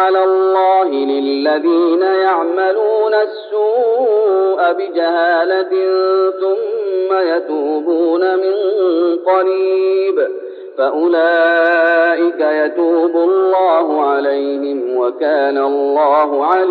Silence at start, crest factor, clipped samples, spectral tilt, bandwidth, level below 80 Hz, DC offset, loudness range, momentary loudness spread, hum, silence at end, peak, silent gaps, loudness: 0 s; 12 dB; under 0.1%; 0.5 dB/octave; 4.8 kHz; -80 dBFS; under 0.1%; 2 LU; 6 LU; none; 0 s; -2 dBFS; none; -14 LUFS